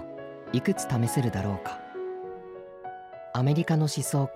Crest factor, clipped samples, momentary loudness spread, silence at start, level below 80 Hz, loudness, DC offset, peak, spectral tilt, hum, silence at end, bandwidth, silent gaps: 14 dB; under 0.1%; 16 LU; 0 s; -62 dBFS; -28 LUFS; under 0.1%; -14 dBFS; -6 dB/octave; none; 0 s; 15.5 kHz; none